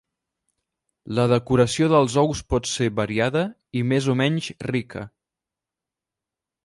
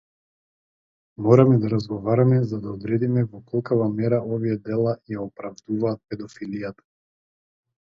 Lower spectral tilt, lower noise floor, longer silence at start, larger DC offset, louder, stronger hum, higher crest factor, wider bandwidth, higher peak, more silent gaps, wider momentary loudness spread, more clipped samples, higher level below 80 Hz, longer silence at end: second, -5.5 dB/octave vs -9.5 dB/octave; about the same, -88 dBFS vs under -90 dBFS; second, 1.05 s vs 1.2 s; neither; about the same, -22 LUFS vs -23 LUFS; neither; about the same, 20 dB vs 20 dB; first, 11.5 kHz vs 7 kHz; about the same, -4 dBFS vs -2 dBFS; neither; second, 10 LU vs 15 LU; neither; first, -46 dBFS vs -60 dBFS; first, 1.55 s vs 1.1 s